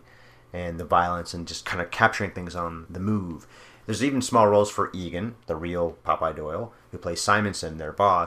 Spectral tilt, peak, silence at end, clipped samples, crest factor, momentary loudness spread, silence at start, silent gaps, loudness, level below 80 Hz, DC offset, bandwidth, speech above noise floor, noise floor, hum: -5 dB/octave; -2 dBFS; 0 s; under 0.1%; 24 dB; 13 LU; 0.55 s; none; -26 LUFS; -54 dBFS; under 0.1%; 15.5 kHz; 27 dB; -52 dBFS; none